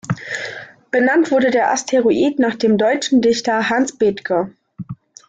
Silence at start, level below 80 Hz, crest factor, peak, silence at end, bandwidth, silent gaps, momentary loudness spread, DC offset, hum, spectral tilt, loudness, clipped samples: 0.05 s; -58 dBFS; 12 dB; -4 dBFS; 0.35 s; 9.2 kHz; none; 15 LU; under 0.1%; none; -4.5 dB/octave; -17 LUFS; under 0.1%